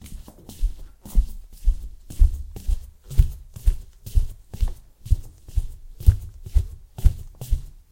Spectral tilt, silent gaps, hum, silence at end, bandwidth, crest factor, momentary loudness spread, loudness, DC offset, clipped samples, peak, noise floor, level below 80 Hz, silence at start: -6.5 dB/octave; none; none; 0.2 s; 16.5 kHz; 22 dB; 14 LU; -28 LUFS; under 0.1%; under 0.1%; 0 dBFS; -39 dBFS; -24 dBFS; 0.05 s